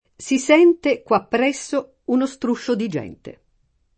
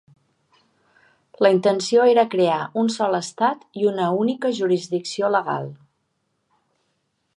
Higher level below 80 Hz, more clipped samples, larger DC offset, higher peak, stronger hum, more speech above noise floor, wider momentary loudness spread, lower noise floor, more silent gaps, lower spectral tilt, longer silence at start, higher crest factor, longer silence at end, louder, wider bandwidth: first, -60 dBFS vs -76 dBFS; neither; neither; about the same, -2 dBFS vs -4 dBFS; neither; second, 45 dB vs 52 dB; first, 12 LU vs 7 LU; second, -64 dBFS vs -72 dBFS; neither; about the same, -4.5 dB/octave vs -5 dB/octave; second, 0.2 s vs 1.4 s; about the same, 18 dB vs 18 dB; second, 0.65 s vs 1.6 s; about the same, -20 LUFS vs -20 LUFS; second, 8.8 kHz vs 11 kHz